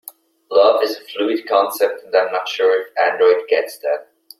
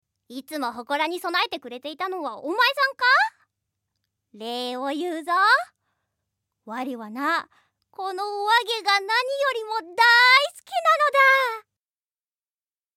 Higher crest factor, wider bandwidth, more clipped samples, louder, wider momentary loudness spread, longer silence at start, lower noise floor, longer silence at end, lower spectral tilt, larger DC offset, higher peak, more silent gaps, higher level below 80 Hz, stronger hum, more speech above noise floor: about the same, 16 dB vs 20 dB; about the same, 16 kHz vs 17 kHz; neither; first, -17 LUFS vs -21 LUFS; second, 8 LU vs 17 LU; first, 0.5 s vs 0.3 s; second, -37 dBFS vs under -90 dBFS; second, 0.4 s vs 1.35 s; about the same, -2 dB/octave vs -1 dB/octave; neither; first, 0 dBFS vs -4 dBFS; neither; first, -74 dBFS vs -82 dBFS; neither; second, 19 dB vs over 67 dB